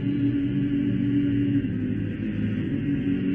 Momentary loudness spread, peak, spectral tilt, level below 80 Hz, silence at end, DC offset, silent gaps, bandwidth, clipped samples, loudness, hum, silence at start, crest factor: 5 LU; -14 dBFS; -10.5 dB/octave; -46 dBFS; 0 s; under 0.1%; none; 3.6 kHz; under 0.1%; -25 LUFS; none; 0 s; 10 dB